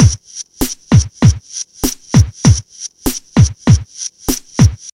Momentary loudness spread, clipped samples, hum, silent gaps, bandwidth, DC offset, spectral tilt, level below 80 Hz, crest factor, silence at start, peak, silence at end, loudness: 12 LU; under 0.1%; none; none; 17 kHz; under 0.1%; -5.5 dB/octave; -24 dBFS; 14 dB; 0 s; 0 dBFS; 0.05 s; -14 LUFS